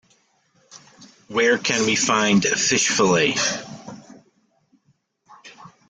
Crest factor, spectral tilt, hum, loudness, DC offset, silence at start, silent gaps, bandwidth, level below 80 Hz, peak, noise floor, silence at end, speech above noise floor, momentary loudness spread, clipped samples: 18 dB; -2.5 dB/octave; none; -19 LUFS; under 0.1%; 0.75 s; none; 10 kHz; -62 dBFS; -4 dBFS; -65 dBFS; 0.2 s; 46 dB; 15 LU; under 0.1%